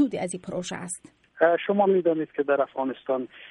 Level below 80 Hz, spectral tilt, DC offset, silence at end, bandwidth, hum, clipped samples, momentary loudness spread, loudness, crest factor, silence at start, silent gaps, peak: -70 dBFS; -5 dB/octave; under 0.1%; 0 s; 11.5 kHz; none; under 0.1%; 11 LU; -25 LUFS; 18 dB; 0 s; none; -8 dBFS